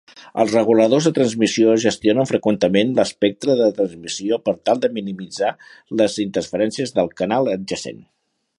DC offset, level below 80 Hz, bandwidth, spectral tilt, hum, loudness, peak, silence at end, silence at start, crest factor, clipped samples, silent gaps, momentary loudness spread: under 0.1%; -58 dBFS; 11.5 kHz; -5 dB/octave; none; -19 LUFS; -2 dBFS; 0.65 s; 0.15 s; 18 dB; under 0.1%; none; 10 LU